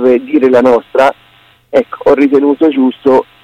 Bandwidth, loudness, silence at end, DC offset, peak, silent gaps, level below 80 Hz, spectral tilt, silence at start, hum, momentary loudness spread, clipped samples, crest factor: 9.2 kHz; -10 LUFS; 0.2 s; under 0.1%; 0 dBFS; none; -50 dBFS; -6.5 dB/octave; 0 s; none; 5 LU; under 0.1%; 10 dB